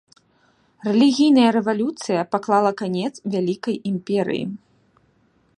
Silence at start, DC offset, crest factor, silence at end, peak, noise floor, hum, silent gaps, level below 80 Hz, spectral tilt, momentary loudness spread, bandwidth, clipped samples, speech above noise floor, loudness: 0.85 s; under 0.1%; 16 dB; 1 s; -4 dBFS; -61 dBFS; none; none; -68 dBFS; -6 dB/octave; 11 LU; 11 kHz; under 0.1%; 42 dB; -20 LUFS